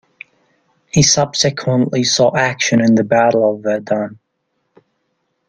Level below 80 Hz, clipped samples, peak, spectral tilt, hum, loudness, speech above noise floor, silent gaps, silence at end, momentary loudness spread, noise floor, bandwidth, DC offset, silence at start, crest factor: -48 dBFS; under 0.1%; 0 dBFS; -4 dB/octave; none; -14 LUFS; 55 dB; none; 1.35 s; 8 LU; -69 dBFS; 10.5 kHz; under 0.1%; 0.95 s; 16 dB